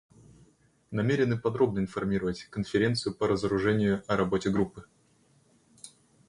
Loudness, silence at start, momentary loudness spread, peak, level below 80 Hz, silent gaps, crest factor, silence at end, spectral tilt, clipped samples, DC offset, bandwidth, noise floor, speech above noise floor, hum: -28 LUFS; 0.9 s; 10 LU; -12 dBFS; -54 dBFS; none; 18 dB; 0.4 s; -6.5 dB/octave; under 0.1%; under 0.1%; 11.5 kHz; -65 dBFS; 37 dB; none